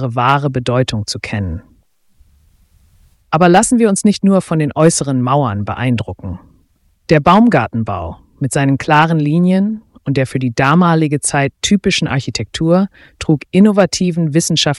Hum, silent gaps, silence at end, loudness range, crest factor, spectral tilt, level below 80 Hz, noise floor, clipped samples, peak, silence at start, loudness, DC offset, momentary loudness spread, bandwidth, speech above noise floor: none; none; 0 s; 3 LU; 14 dB; -5.5 dB/octave; -42 dBFS; -56 dBFS; under 0.1%; 0 dBFS; 0 s; -14 LUFS; under 0.1%; 12 LU; 12 kHz; 43 dB